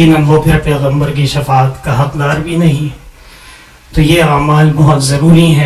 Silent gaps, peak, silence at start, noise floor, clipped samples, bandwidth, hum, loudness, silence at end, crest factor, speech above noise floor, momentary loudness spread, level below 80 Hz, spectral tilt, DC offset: none; 0 dBFS; 0 s; -36 dBFS; 0.3%; 13.5 kHz; none; -10 LUFS; 0 s; 10 dB; 28 dB; 7 LU; -28 dBFS; -6.5 dB/octave; under 0.1%